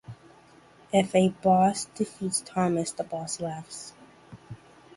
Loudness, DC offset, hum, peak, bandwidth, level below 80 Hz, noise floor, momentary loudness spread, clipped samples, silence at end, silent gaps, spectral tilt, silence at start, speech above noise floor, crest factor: -27 LUFS; under 0.1%; none; -8 dBFS; 11.5 kHz; -62 dBFS; -55 dBFS; 24 LU; under 0.1%; 0.4 s; none; -5 dB/octave; 0.1 s; 29 dB; 20 dB